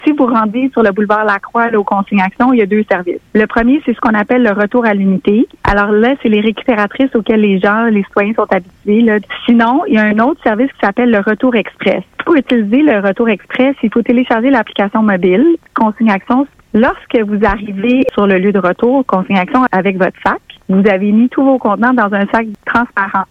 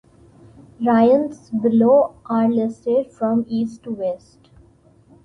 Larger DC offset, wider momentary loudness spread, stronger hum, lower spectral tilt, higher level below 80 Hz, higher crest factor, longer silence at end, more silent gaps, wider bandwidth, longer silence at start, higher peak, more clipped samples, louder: neither; second, 4 LU vs 12 LU; neither; about the same, -8.5 dB/octave vs -8.5 dB/octave; first, -38 dBFS vs -58 dBFS; about the same, 12 dB vs 16 dB; second, 0.05 s vs 1.05 s; neither; second, 5.8 kHz vs 6.4 kHz; second, 0 s vs 0.8 s; first, 0 dBFS vs -4 dBFS; neither; first, -12 LUFS vs -19 LUFS